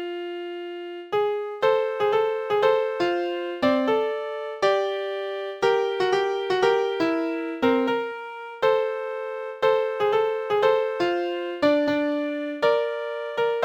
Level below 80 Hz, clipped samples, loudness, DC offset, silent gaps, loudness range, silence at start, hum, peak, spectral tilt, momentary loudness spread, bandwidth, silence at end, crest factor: -66 dBFS; under 0.1%; -24 LUFS; under 0.1%; none; 1 LU; 0 s; none; -6 dBFS; -5 dB/octave; 10 LU; 9.2 kHz; 0 s; 18 dB